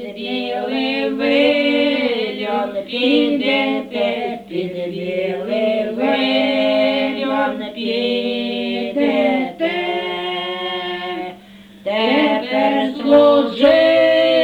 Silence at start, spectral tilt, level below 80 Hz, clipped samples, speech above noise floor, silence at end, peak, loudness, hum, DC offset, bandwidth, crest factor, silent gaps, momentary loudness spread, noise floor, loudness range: 0 s; -6 dB/octave; -56 dBFS; under 0.1%; 24 dB; 0 s; -2 dBFS; -17 LUFS; none; under 0.1%; 9.4 kHz; 16 dB; none; 11 LU; -41 dBFS; 4 LU